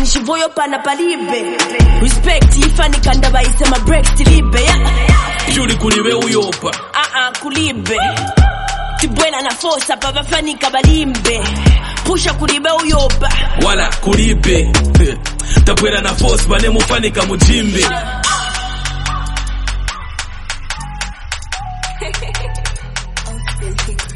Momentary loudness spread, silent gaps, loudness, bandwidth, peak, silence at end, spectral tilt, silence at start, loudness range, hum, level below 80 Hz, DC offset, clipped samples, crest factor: 11 LU; none; -14 LUFS; 11.5 kHz; 0 dBFS; 0 s; -4 dB/octave; 0 s; 10 LU; none; -14 dBFS; under 0.1%; under 0.1%; 12 dB